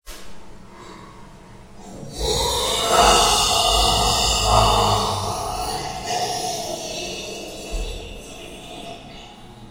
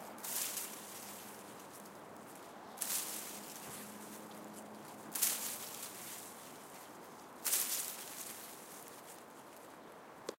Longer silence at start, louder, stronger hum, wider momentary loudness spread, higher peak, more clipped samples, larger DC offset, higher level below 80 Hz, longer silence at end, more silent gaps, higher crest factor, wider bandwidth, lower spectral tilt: about the same, 0.05 s vs 0 s; first, -19 LUFS vs -41 LUFS; neither; first, 24 LU vs 19 LU; first, -2 dBFS vs -12 dBFS; neither; neither; first, -32 dBFS vs -86 dBFS; about the same, 0 s vs 0.05 s; neither; second, 20 dB vs 32 dB; about the same, 16 kHz vs 17 kHz; first, -2.5 dB/octave vs -0.5 dB/octave